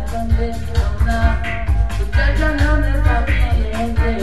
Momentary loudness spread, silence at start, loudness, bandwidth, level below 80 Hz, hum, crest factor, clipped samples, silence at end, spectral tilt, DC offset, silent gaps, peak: 4 LU; 0 s; -18 LUFS; 12 kHz; -18 dBFS; none; 14 dB; under 0.1%; 0 s; -7 dB/octave; 5%; none; -2 dBFS